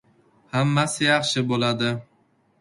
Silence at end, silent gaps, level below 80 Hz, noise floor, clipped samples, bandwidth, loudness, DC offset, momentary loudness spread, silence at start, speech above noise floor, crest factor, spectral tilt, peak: 0.6 s; none; -62 dBFS; -63 dBFS; under 0.1%; 11.5 kHz; -22 LUFS; under 0.1%; 7 LU; 0.55 s; 41 dB; 18 dB; -4.5 dB/octave; -6 dBFS